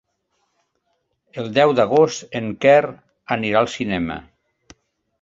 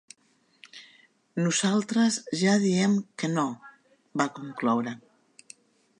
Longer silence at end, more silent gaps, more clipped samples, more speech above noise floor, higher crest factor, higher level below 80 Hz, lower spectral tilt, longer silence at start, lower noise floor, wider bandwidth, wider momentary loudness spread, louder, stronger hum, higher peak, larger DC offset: about the same, 1 s vs 1 s; neither; neither; first, 53 dB vs 41 dB; about the same, 18 dB vs 20 dB; first, -54 dBFS vs -78 dBFS; about the same, -5 dB/octave vs -4.5 dB/octave; first, 1.35 s vs 0.75 s; first, -71 dBFS vs -67 dBFS; second, 7.8 kHz vs 11 kHz; second, 16 LU vs 21 LU; first, -18 LUFS vs -26 LUFS; neither; first, -2 dBFS vs -8 dBFS; neither